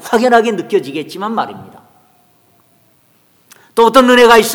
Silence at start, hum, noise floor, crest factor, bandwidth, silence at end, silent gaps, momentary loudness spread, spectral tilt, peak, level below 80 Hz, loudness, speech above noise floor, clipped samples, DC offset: 0.05 s; none; -53 dBFS; 14 dB; 19.5 kHz; 0 s; none; 15 LU; -3.5 dB/octave; 0 dBFS; -50 dBFS; -11 LUFS; 43 dB; 0.6%; under 0.1%